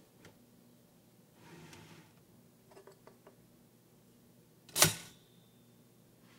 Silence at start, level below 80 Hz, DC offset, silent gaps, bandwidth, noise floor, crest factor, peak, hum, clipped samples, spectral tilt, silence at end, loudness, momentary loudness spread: 4.75 s; -72 dBFS; under 0.1%; none; 16 kHz; -64 dBFS; 34 dB; -8 dBFS; none; under 0.1%; -1.5 dB/octave; 1.3 s; -30 LUFS; 31 LU